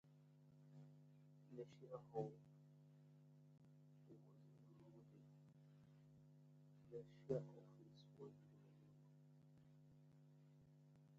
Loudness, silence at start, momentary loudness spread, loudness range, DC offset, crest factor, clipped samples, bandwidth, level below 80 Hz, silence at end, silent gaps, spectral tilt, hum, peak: -58 LUFS; 0.05 s; 18 LU; 11 LU; under 0.1%; 28 dB; under 0.1%; 7.4 kHz; under -90 dBFS; 0 s; none; -8.5 dB/octave; 50 Hz at -75 dBFS; -32 dBFS